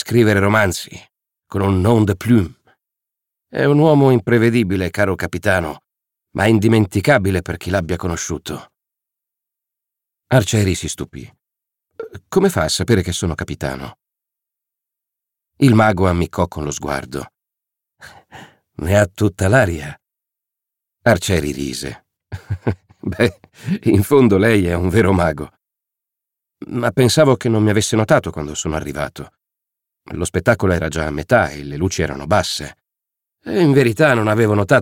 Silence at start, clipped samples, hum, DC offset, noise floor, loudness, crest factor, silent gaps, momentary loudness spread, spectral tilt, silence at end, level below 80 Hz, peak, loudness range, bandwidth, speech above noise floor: 0 s; under 0.1%; none; under 0.1%; -84 dBFS; -17 LUFS; 16 dB; none; 15 LU; -6 dB/octave; 0 s; -40 dBFS; -2 dBFS; 6 LU; 17 kHz; 68 dB